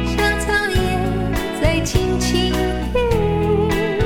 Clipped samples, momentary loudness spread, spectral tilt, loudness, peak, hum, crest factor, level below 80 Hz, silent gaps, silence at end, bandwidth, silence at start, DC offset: under 0.1%; 3 LU; -5 dB/octave; -19 LUFS; -4 dBFS; none; 14 dB; -26 dBFS; none; 0 s; 19.5 kHz; 0 s; under 0.1%